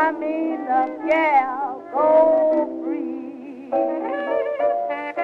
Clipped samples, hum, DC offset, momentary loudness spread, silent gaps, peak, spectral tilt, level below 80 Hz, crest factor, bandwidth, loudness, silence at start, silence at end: under 0.1%; none; under 0.1%; 11 LU; none; -4 dBFS; -6 dB/octave; -66 dBFS; 16 dB; 5.4 kHz; -21 LUFS; 0 s; 0 s